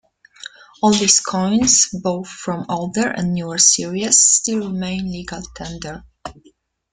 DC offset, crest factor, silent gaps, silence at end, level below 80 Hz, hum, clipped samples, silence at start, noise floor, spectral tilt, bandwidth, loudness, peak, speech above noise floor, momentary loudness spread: under 0.1%; 20 dB; none; 0.6 s; -48 dBFS; none; under 0.1%; 0.4 s; -55 dBFS; -2.5 dB/octave; 11 kHz; -16 LUFS; 0 dBFS; 37 dB; 24 LU